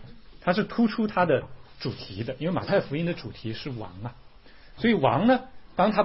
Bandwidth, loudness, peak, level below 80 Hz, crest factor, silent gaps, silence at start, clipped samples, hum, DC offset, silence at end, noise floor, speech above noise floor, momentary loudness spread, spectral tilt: 5.8 kHz; -27 LUFS; -8 dBFS; -52 dBFS; 20 dB; none; 0 s; under 0.1%; none; 0.3%; 0 s; -50 dBFS; 25 dB; 14 LU; -10 dB/octave